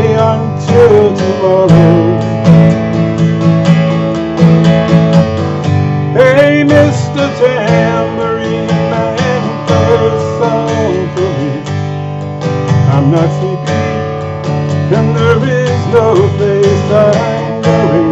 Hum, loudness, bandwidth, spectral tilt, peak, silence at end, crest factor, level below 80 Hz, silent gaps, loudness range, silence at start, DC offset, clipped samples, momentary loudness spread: none; -10 LUFS; 8 kHz; -7.5 dB/octave; 0 dBFS; 0 s; 10 dB; -40 dBFS; none; 5 LU; 0 s; under 0.1%; 2%; 8 LU